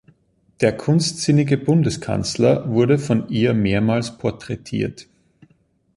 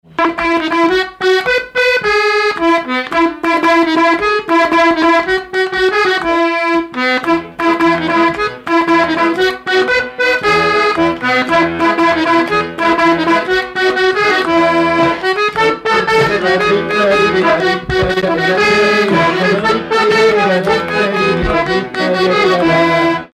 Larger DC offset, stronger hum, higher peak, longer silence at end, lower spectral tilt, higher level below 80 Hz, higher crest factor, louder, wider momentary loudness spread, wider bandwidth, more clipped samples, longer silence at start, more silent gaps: neither; neither; about the same, -2 dBFS vs -2 dBFS; first, 0.95 s vs 0.1 s; about the same, -6 dB/octave vs -5 dB/octave; second, -48 dBFS vs -38 dBFS; first, 18 dB vs 10 dB; second, -19 LUFS vs -12 LUFS; first, 8 LU vs 4 LU; second, 11.5 kHz vs 13.5 kHz; neither; first, 0.6 s vs 0.2 s; neither